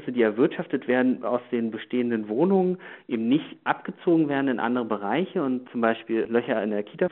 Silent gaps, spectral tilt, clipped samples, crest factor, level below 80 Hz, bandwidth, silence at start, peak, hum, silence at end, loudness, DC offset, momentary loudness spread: none; -5.5 dB/octave; under 0.1%; 18 dB; -74 dBFS; 4.1 kHz; 0 s; -6 dBFS; none; 0.05 s; -25 LUFS; under 0.1%; 7 LU